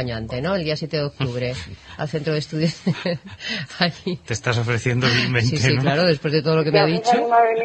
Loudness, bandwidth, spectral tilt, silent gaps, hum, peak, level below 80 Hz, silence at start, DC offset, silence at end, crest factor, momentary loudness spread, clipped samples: -21 LUFS; 8.8 kHz; -5.5 dB/octave; none; none; -2 dBFS; -48 dBFS; 0 s; under 0.1%; 0 s; 18 dB; 10 LU; under 0.1%